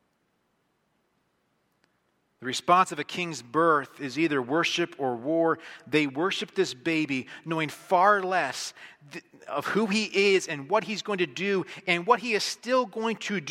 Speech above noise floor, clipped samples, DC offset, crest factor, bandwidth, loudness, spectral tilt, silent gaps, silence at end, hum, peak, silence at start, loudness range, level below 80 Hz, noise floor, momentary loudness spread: 46 dB; under 0.1%; under 0.1%; 20 dB; 16 kHz; -26 LUFS; -4 dB/octave; none; 0 s; none; -6 dBFS; 2.4 s; 2 LU; -76 dBFS; -73 dBFS; 10 LU